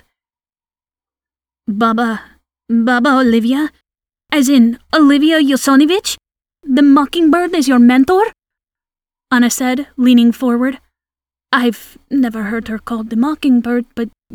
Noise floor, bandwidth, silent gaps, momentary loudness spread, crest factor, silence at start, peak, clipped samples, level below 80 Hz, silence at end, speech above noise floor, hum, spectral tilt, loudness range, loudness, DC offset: under -90 dBFS; 18 kHz; none; 12 LU; 14 dB; 1.7 s; 0 dBFS; under 0.1%; -50 dBFS; 0.25 s; over 78 dB; none; -4 dB/octave; 6 LU; -13 LUFS; under 0.1%